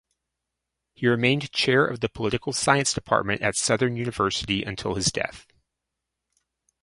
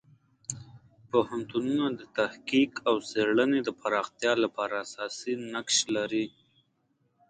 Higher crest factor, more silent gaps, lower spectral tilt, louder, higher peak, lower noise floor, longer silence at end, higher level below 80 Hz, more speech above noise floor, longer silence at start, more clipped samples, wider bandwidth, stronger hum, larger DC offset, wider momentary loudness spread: about the same, 24 dB vs 20 dB; neither; about the same, -3.5 dB/octave vs -3 dB/octave; first, -24 LUFS vs -29 LUFS; first, -2 dBFS vs -10 dBFS; first, -84 dBFS vs -73 dBFS; first, 1.4 s vs 1 s; first, -52 dBFS vs -70 dBFS; first, 60 dB vs 44 dB; first, 1 s vs 0.5 s; neither; first, 11.5 kHz vs 9.4 kHz; neither; neither; second, 6 LU vs 11 LU